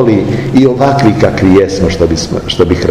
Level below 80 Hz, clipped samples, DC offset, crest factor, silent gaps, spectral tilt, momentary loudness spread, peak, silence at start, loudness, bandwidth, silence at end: -28 dBFS; 4%; under 0.1%; 8 dB; none; -6.5 dB/octave; 4 LU; 0 dBFS; 0 s; -9 LUFS; 12.5 kHz; 0 s